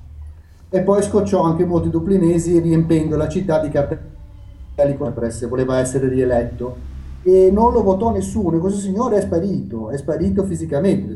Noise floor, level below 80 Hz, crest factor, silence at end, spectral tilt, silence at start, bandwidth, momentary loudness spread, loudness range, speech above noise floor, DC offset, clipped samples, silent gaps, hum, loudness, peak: -38 dBFS; -36 dBFS; 14 dB; 0 s; -8 dB/octave; 0 s; 12 kHz; 10 LU; 4 LU; 22 dB; under 0.1%; under 0.1%; none; none; -18 LUFS; -2 dBFS